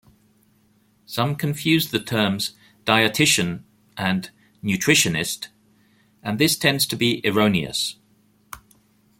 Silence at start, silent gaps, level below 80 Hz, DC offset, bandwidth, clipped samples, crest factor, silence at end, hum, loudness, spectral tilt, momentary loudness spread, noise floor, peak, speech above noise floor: 1.1 s; none; -58 dBFS; under 0.1%; 17 kHz; under 0.1%; 22 dB; 0.6 s; none; -21 LUFS; -3.5 dB/octave; 19 LU; -61 dBFS; -2 dBFS; 40 dB